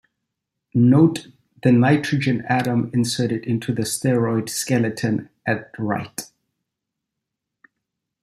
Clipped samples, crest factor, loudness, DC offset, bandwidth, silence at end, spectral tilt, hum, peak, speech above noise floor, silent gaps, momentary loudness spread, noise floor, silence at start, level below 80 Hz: under 0.1%; 18 dB; -20 LUFS; under 0.1%; 15 kHz; 2 s; -6 dB/octave; none; -4 dBFS; 63 dB; none; 10 LU; -82 dBFS; 0.75 s; -60 dBFS